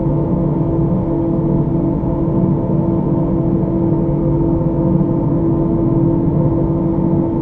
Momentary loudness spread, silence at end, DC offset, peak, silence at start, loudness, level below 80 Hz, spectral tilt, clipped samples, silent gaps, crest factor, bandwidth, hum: 2 LU; 0 s; under 0.1%; -2 dBFS; 0 s; -16 LUFS; -28 dBFS; -13.5 dB/octave; under 0.1%; none; 12 dB; 2.7 kHz; none